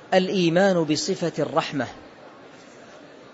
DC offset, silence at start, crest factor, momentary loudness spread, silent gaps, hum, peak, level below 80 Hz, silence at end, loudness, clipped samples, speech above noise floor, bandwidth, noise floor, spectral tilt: under 0.1%; 0 s; 18 dB; 11 LU; none; none; -6 dBFS; -66 dBFS; 0.1 s; -23 LUFS; under 0.1%; 24 dB; 8 kHz; -46 dBFS; -5 dB/octave